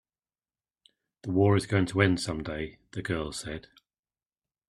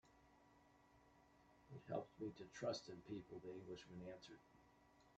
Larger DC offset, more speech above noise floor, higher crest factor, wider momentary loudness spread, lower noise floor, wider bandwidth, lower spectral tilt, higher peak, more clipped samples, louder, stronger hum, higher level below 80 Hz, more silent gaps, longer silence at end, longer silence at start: neither; first, over 62 dB vs 20 dB; about the same, 24 dB vs 22 dB; about the same, 15 LU vs 14 LU; first, under -90 dBFS vs -73 dBFS; first, 12 kHz vs 8.4 kHz; about the same, -6 dB/octave vs -5.5 dB/octave; first, -6 dBFS vs -34 dBFS; neither; first, -28 LUFS vs -53 LUFS; neither; first, -54 dBFS vs -80 dBFS; neither; first, 1.1 s vs 0 s; first, 1.25 s vs 0.05 s